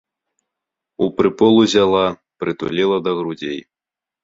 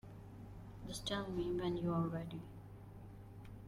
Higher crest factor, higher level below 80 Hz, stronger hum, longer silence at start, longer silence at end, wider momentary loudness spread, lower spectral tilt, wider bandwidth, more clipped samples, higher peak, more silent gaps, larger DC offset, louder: about the same, 18 dB vs 16 dB; about the same, -54 dBFS vs -58 dBFS; second, none vs 50 Hz at -55 dBFS; first, 1 s vs 0.05 s; first, 0.65 s vs 0 s; second, 13 LU vs 17 LU; about the same, -5.5 dB/octave vs -6 dB/octave; second, 7.8 kHz vs 15.5 kHz; neither; first, -2 dBFS vs -28 dBFS; neither; neither; first, -17 LUFS vs -41 LUFS